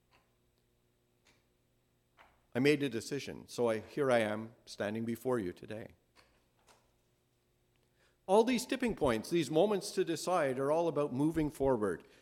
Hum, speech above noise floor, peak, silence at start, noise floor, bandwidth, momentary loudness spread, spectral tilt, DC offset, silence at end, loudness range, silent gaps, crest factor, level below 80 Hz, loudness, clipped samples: none; 42 dB; -14 dBFS; 2.55 s; -75 dBFS; 16.5 kHz; 12 LU; -5.5 dB/octave; under 0.1%; 0.2 s; 9 LU; none; 20 dB; -62 dBFS; -33 LUFS; under 0.1%